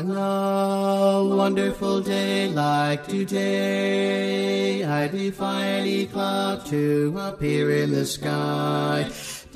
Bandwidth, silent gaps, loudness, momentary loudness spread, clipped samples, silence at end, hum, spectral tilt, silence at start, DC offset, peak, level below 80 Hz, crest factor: 15.5 kHz; none; -23 LUFS; 5 LU; under 0.1%; 0.1 s; none; -5.5 dB/octave; 0 s; under 0.1%; -8 dBFS; -54 dBFS; 14 dB